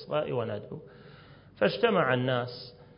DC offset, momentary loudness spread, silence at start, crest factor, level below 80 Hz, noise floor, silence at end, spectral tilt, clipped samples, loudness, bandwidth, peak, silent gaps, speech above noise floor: under 0.1%; 19 LU; 0 s; 20 dB; -64 dBFS; -53 dBFS; 0.15 s; -10 dB/octave; under 0.1%; -29 LUFS; 5.4 kHz; -10 dBFS; none; 24 dB